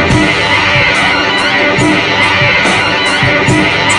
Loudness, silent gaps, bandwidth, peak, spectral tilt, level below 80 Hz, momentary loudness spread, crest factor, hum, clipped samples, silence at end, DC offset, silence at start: -8 LUFS; none; 11.5 kHz; 0 dBFS; -4 dB/octave; -32 dBFS; 2 LU; 10 dB; none; under 0.1%; 0 s; under 0.1%; 0 s